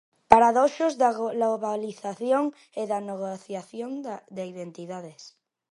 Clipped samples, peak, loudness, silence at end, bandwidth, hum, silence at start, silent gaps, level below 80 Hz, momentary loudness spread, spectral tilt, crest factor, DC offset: under 0.1%; 0 dBFS; -25 LUFS; 0.4 s; 11.5 kHz; none; 0.3 s; none; -58 dBFS; 18 LU; -5.5 dB/octave; 26 dB; under 0.1%